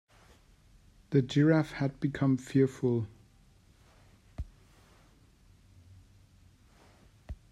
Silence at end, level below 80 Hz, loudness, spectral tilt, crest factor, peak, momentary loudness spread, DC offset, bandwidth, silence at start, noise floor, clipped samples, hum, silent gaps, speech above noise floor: 0.15 s; -56 dBFS; -29 LUFS; -8 dB/octave; 20 dB; -12 dBFS; 22 LU; under 0.1%; 11.5 kHz; 1.1 s; -61 dBFS; under 0.1%; none; none; 34 dB